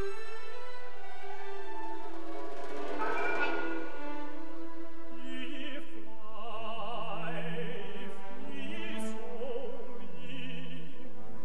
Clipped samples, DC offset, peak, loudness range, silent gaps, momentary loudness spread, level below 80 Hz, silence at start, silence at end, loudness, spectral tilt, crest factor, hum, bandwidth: under 0.1%; 6%; -16 dBFS; 5 LU; none; 13 LU; -70 dBFS; 0 s; 0 s; -41 LUFS; -5.5 dB/octave; 22 dB; none; 12 kHz